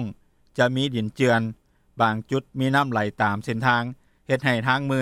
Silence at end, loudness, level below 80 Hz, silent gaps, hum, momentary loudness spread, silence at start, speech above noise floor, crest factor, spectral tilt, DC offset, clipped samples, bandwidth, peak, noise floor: 0 s; -23 LUFS; -60 dBFS; none; none; 10 LU; 0 s; 20 dB; 18 dB; -6 dB/octave; under 0.1%; under 0.1%; 14 kHz; -6 dBFS; -42 dBFS